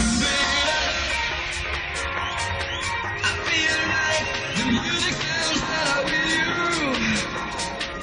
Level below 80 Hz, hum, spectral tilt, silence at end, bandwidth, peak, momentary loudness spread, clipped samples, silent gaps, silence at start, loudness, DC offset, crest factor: -40 dBFS; none; -2.5 dB/octave; 0 s; 10.5 kHz; -8 dBFS; 6 LU; under 0.1%; none; 0 s; -22 LUFS; under 0.1%; 16 dB